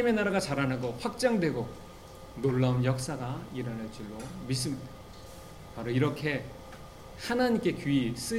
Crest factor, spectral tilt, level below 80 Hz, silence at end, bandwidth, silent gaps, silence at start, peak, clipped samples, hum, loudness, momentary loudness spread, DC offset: 18 dB; -6 dB/octave; -54 dBFS; 0 s; 16 kHz; none; 0 s; -12 dBFS; under 0.1%; none; -31 LUFS; 20 LU; 0.1%